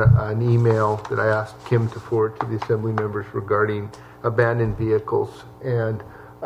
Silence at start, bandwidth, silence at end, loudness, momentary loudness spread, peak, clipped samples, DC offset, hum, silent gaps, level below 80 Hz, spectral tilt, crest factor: 0 s; 8 kHz; 0 s; -22 LUFS; 10 LU; -4 dBFS; under 0.1%; under 0.1%; none; none; -44 dBFS; -9 dB/octave; 18 dB